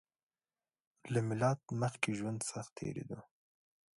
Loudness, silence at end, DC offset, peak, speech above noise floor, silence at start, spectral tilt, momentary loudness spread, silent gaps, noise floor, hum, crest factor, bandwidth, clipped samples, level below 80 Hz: -38 LUFS; 0.75 s; under 0.1%; -12 dBFS; over 53 dB; 1.05 s; -5.5 dB/octave; 13 LU; 2.72-2.76 s; under -90 dBFS; none; 26 dB; 11.5 kHz; under 0.1%; -72 dBFS